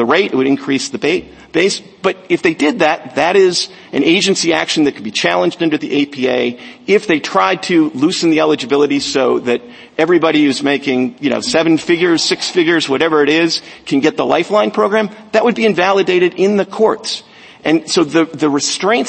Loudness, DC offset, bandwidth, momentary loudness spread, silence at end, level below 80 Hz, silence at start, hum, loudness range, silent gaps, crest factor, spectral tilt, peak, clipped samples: -14 LUFS; under 0.1%; 8.8 kHz; 6 LU; 0 s; -56 dBFS; 0 s; none; 1 LU; none; 14 dB; -4 dB/octave; 0 dBFS; under 0.1%